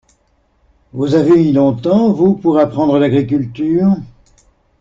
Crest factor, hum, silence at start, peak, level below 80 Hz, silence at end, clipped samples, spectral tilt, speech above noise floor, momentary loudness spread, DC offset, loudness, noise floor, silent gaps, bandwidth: 12 dB; none; 0.95 s; -2 dBFS; -48 dBFS; 0.75 s; under 0.1%; -9 dB/octave; 46 dB; 7 LU; under 0.1%; -13 LUFS; -58 dBFS; none; 7.6 kHz